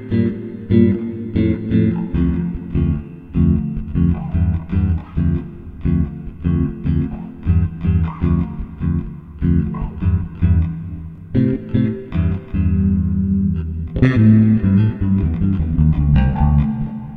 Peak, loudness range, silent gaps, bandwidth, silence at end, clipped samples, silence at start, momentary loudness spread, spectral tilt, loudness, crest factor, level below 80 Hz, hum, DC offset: 0 dBFS; 5 LU; none; 4.4 kHz; 0 s; under 0.1%; 0 s; 10 LU; -11.5 dB/octave; -18 LUFS; 16 dB; -26 dBFS; none; under 0.1%